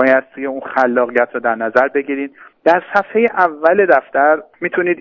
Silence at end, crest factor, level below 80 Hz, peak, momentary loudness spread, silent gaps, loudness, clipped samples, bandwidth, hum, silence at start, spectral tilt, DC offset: 0 s; 14 dB; -64 dBFS; 0 dBFS; 9 LU; none; -15 LUFS; under 0.1%; 6.8 kHz; none; 0 s; -7 dB/octave; under 0.1%